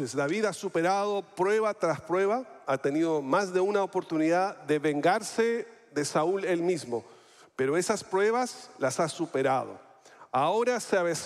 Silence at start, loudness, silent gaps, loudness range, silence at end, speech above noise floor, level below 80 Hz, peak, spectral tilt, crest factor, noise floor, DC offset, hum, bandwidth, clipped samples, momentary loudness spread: 0 s; -28 LUFS; none; 2 LU; 0 s; 26 dB; -76 dBFS; -12 dBFS; -4.5 dB/octave; 16 dB; -54 dBFS; under 0.1%; none; 14 kHz; under 0.1%; 6 LU